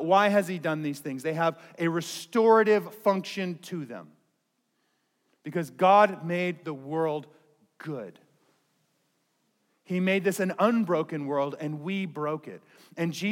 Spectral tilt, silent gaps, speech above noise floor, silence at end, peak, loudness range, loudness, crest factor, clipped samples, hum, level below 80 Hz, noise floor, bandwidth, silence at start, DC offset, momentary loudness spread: -6 dB/octave; none; 49 dB; 0 s; -8 dBFS; 8 LU; -27 LUFS; 20 dB; under 0.1%; none; -90 dBFS; -76 dBFS; 17 kHz; 0 s; under 0.1%; 17 LU